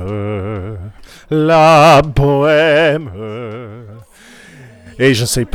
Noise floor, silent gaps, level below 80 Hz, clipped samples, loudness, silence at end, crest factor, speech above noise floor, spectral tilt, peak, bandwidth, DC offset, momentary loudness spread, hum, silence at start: -41 dBFS; none; -34 dBFS; under 0.1%; -11 LUFS; 0.1 s; 12 dB; 31 dB; -5.5 dB/octave; -2 dBFS; 16.5 kHz; under 0.1%; 21 LU; none; 0 s